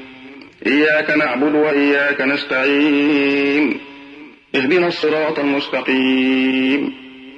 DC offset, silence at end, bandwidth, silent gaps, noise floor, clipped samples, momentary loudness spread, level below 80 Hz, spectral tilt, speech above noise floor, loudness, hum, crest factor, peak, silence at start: under 0.1%; 0 s; 7.2 kHz; none; -39 dBFS; under 0.1%; 7 LU; -64 dBFS; -6 dB/octave; 24 dB; -16 LUFS; none; 14 dB; -2 dBFS; 0 s